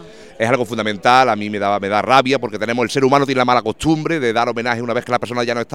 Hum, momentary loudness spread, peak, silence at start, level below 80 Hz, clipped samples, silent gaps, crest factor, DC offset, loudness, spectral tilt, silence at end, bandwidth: none; 7 LU; 0 dBFS; 0 s; -50 dBFS; under 0.1%; none; 16 dB; 0.5%; -17 LUFS; -5 dB/octave; 0 s; 16 kHz